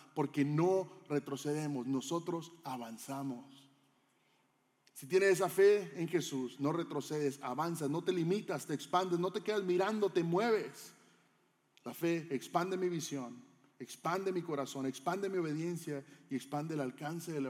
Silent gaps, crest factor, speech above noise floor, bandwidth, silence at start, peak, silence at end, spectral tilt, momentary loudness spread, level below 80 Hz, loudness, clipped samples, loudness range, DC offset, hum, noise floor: none; 18 dB; 40 dB; 16.5 kHz; 0 s; -18 dBFS; 0 s; -5.5 dB/octave; 13 LU; under -90 dBFS; -36 LUFS; under 0.1%; 6 LU; under 0.1%; none; -75 dBFS